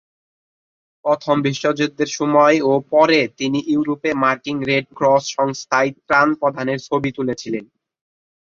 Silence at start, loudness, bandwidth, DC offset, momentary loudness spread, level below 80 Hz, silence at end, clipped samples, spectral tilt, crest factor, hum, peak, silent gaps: 1.05 s; -18 LUFS; 7.6 kHz; under 0.1%; 9 LU; -60 dBFS; 0.85 s; under 0.1%; -5 dB/octave; 16 dB; none; -2 dBFS; none